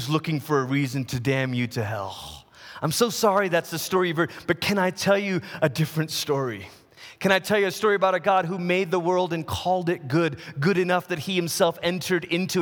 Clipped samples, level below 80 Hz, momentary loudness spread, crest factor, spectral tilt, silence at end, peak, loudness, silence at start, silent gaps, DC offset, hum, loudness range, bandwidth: under 0.1%; -58 dBFS; 7 LU; 20 dB; -5 dB/octave; 0 s; -4 dBFS; -24 LUFS; 0 s; none; under 0.1%; none; 2 LU; over 20 kHz